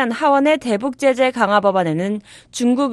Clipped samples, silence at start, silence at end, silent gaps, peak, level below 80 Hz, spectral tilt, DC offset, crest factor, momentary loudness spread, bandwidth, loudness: under 0.1%; 0 s; 0 s; none; -2 dBFS; -60 dBFS; -5 dB/octave; under 0.1%; 14 dB; 8 LU; 12.5 kHz; -17 LUFS